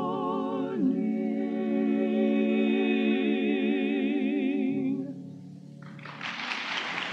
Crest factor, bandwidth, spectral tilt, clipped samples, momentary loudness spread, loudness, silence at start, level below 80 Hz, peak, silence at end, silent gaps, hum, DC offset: 14 dB; 7.6 kHz; -6.5 dB/octave; under 0.1%; 17 LU; -28 LUFS; 0 s; -86 dBFS; -14 dBFS; 0 s; none; none; under 0.1%